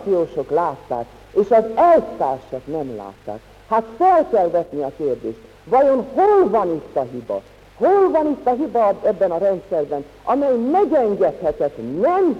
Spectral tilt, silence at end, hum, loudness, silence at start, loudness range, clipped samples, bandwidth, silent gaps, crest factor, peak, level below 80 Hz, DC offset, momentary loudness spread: -8 dB/octave; 0 s; none; -19 LUFS; 0 s; 2 LU; under 0.1%; 9 kHz; none; 14 dB; -4 dBFS; -52 dBFS; under 0.1%; 13 LU